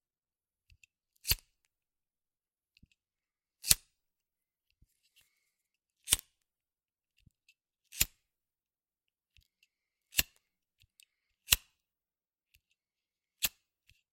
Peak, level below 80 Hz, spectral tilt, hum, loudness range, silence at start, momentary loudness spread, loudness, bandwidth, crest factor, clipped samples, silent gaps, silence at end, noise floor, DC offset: -2 dBFS; -56 dBFS; 0.5 dB/octave; none; 6 LU; 1.25 s; 15 LU; -32 LUFS; 16.5 kHz; 40 dB; under 0.1%; none; 0.65 s; under -90 dBFS; under 0.1%